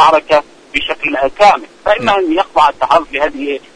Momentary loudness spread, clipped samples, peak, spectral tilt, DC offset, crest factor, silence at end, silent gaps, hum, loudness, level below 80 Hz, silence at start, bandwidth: 7 LU; under 0.1%; 0 dBFS; -3.5 dB/octave; under 0.1%; 12 dB; 0.2 s; none; none; -13 LUFS; -42 dBFS; 0 s; 10.5 kHz